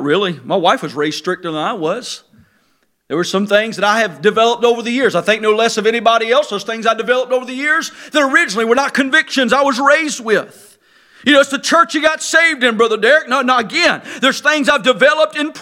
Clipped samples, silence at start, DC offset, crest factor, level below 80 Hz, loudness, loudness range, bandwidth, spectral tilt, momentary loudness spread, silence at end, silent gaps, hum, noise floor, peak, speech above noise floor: under 0.1%; 0 s; under 0.1%; 14 dB; -62 dBFS; -14 LUFS; 5 LU; 16.5 kHz; -3 dB/octave; 8 LU; 0 s; none; none; -60 dBFS; 0 dBFS; 46 dB